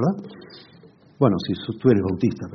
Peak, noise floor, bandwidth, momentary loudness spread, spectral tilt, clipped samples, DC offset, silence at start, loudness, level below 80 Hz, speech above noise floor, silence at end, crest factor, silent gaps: -4 dBFS; -50 dBFS; 6.4 kHz; 17 LU; -7.5 dB/octave; under 0.1%; under 0.1%; 0 s; -22 LUFS; -58 dBFS; 29 dB; 0 s; 18 dB; none